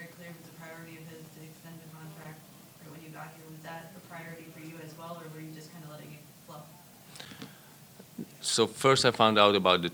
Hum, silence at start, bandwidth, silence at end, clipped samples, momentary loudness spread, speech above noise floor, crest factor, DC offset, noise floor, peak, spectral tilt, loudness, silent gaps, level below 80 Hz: none; 0 s; 19 kHz; 0 s; under 0.1%; 26 LU; 29 dB; 26 dB; under 0.1%; -53 dBFS; -6 dBFS; -3.5 dB/octave; -24 LUFS; none; -72 dBFS